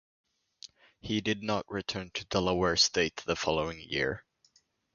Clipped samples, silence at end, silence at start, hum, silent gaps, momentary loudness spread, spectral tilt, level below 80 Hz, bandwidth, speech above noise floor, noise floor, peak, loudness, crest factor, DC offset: under 0.1%; 0.75 s; 1.05 s; none; none; 23 LU; -3.5 dB/octave; -54 dBFS; 10 kHz; 38 dB; -69 dBFS; -12 dBFS; -30 LUFS; 20 dB; under 0.1%